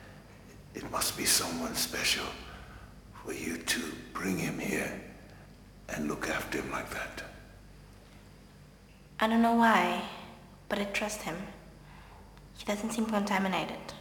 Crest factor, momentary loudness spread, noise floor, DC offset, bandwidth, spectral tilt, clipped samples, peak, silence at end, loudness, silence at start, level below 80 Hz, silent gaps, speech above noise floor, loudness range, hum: 24 dB; 25 LU; -55 dBFS; under 0.1%; over 20 kHz; -3 dB/octave; under 0.1%; -10 dBFS; 0 s; -31 LUFS; 0 s; -56 dBFS; none; 23 dB; 8 LU; none